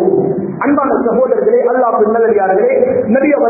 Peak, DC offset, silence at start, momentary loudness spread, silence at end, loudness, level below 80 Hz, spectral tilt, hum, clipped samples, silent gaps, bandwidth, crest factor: 0 dBFS; under 0.1%; 0 s; 3 LU; 0 s; -12 LUFS; -50 dBFS; -16.5 dB/octave; none; under 0.1%; none; 2.7 kHz; 12 dB